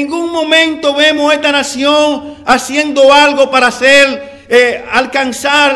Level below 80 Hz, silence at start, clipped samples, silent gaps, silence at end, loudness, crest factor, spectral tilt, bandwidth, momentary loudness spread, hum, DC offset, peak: -48 dBFS; 0 s; 2%; none; 0 s; -9 LUFS; 10 dB; -1.5 dB/octave; 12 kHz; 8 LU; none; under 0.1%; 0 dBFS